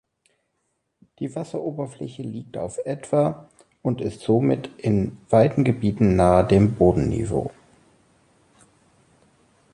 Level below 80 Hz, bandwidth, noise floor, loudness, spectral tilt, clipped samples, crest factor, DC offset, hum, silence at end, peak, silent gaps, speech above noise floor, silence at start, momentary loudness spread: -42 dBFS; 11 kHz; -74 dBFS; -22 LUFS; -8 dB/octave; under 0.1%; 20 dB; under 0.1%; none; 2.25 s; -4 dBFS; none; 53 dB; 1.2 s; 16 LU